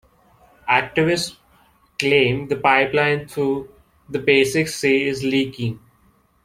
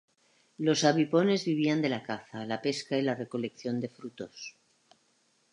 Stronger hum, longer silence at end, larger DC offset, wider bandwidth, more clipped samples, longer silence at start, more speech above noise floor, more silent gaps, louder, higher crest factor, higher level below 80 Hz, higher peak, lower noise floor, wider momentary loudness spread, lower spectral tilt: neither; second, 0.65 s vs 1 s; neither; first, 16 kHz vs 11 kHz; neither; about the same, 0.65 s vs 0.6 s; about the same, 39 dB vs 41 dB; neither; first, -19 LUFS vs -30 LUFS; about the same, 20 dB vs 22 dB; first, -54 dBFS vs -80 dBFS; first, 0 dBFS vs -10 dBFS; second, -58 dBFS vs -70 dBFS; second, 12 LU vs 17 LU; about the same, -4.5 dB/octave vs -5 dB/octave